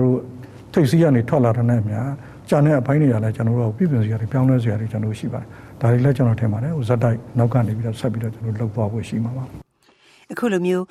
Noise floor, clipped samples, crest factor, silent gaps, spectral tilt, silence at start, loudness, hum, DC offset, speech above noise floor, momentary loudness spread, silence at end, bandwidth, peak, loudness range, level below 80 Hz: -55 dBFS; under 0.1%; 16 dB; none; -8.5 dB/octave; 0 s; -20 LUFS; none; under 0.1%; 37 dB; 11 LU; 0.05 s; 12.5 kHz; -4 dBFS; 5 LU; -50 dBFS